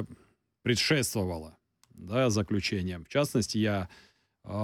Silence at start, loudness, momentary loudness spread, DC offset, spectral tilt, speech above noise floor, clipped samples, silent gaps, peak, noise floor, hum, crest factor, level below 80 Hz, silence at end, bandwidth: 0 s; -29 LUFS; 16 LU; under 0.1%; -4.5 dB/octave; 35 dB; under 0.1%; none; -14 dBFS; -64 dBFS; none; 18 dB; -56 dBFS; 0 s; 19 kHz